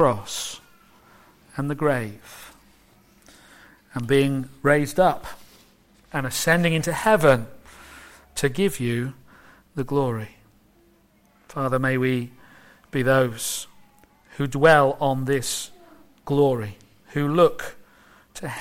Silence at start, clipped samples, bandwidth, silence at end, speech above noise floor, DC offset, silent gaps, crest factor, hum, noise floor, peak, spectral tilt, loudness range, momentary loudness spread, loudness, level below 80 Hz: 0 s; under 0.1%; 16.5 kHz; 0 s; 37 dB; under 0.1%; none; 20 dB; none; -59 dBFS; -4 dBFS; -5 dB/octave; 7 LU; 22 LU; -22 LUFS; -52 dBFS